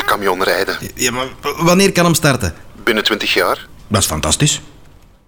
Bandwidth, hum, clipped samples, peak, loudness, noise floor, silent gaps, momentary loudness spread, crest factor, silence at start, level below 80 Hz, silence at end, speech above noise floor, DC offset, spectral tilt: over 20 kHz; none; under 0.1%; -2 dBFS; -15 LUFS; -43 dBFS; none; 9 LU; 14 dB; 0 s; -38 dBFS; 0.45 s; 28 dB; 0.7%; -3.5 dB/octave